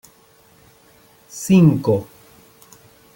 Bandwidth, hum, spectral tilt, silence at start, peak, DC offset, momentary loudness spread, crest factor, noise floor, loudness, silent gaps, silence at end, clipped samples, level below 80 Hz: 17 kHz; none; -7.5 dB/octave; 1.35 s; -2 dBFS; under 0.1%; 18 LU; 18 dB; -52 dBFS; -16 LUFS; none; 1.1 s; under 0.1%; -54 dBFS